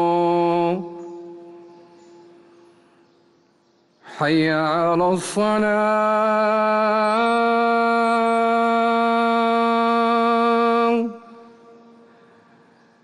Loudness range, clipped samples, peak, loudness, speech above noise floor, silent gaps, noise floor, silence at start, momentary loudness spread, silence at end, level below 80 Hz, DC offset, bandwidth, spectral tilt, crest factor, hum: 8 LU; under 0.1%; -8 dBFS; -19 LUFS; 42 dB; none; -60 dBFS; 0 s; 6 LU; 1.65 s; -66 dBFS; under 0.1%; 12 kHz; -5.5 dB/octave; 12 dB; none